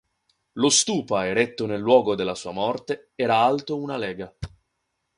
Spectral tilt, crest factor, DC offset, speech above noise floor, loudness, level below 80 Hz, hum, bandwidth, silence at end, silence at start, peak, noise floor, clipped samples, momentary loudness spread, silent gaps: -3 dB/octave; 20 dB; under 0.1%; 54 dB; -23 LUFS; -54 dBFS; none; 11.5 kHz; 0.7 s; 0.55 s; -4 dBFS; -77 dBFS; under 0.1%; 16 LU; none